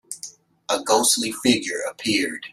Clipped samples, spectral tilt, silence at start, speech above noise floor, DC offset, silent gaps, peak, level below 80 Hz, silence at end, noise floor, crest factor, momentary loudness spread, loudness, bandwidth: under 0.1%; -2 dB/octave; 0.1 s; 21 dB; under 0.1%; none; -2 dBFS; -64 dBFS; 0.05 s; -42 dBFS; 20 dB; 17 LU; -21 LUFS; 15.5 kHz